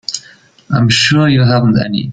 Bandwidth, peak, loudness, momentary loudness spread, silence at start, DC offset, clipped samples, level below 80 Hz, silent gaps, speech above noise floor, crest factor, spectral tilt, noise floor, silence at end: 9.2 kHz; 0 dBFS; -11 LUFS; 11 LU; 0.1 s; under 0.1%; under 0.1%; -42 dBFS; none; 33 dB; 12 dB; -5 dB/octave; -43 dBFS; 0 s